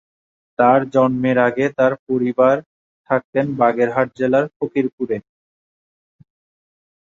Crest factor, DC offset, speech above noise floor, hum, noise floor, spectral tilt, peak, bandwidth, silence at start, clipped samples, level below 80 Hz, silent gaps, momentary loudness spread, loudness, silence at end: 18 dB; under 0.1%; over 73 dB; none; under -90 dBFS; -8 dB/octave; -2 dBFS; 7.4 kHz; 0.6 s; under 0.1%; -60 dBFS; 1.99-2.07 s, 2.66-3.04 s, 3.24-3.33 s, 4.56-4.60 s, 4.93-4.98 s; 7 LU; -18 LUFS; 1.8 s